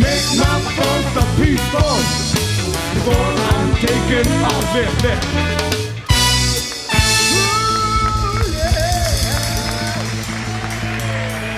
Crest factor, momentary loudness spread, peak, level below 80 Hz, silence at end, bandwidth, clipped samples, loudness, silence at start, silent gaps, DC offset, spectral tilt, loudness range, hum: 16 dB; 8 LU; 0 dBFS; -24 dBFS; 0 s; 16 kHz; under 0.1%; -16 LUFS; 0 s; none; under 0.1%; -4 dB/octave; 3 LU; none